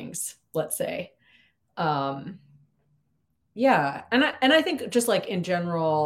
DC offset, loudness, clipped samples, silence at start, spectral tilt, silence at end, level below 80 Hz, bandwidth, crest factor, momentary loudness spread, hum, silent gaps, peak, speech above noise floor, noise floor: under 0.1%; -25 LUFS; under 0.1%; 0 s; -4 dB/octave; 0 s; -72 dBFS; 16.5 kHz; 20 dB; 16 LU; none; none; -6 dBFS; 49 dB; -73 dBFS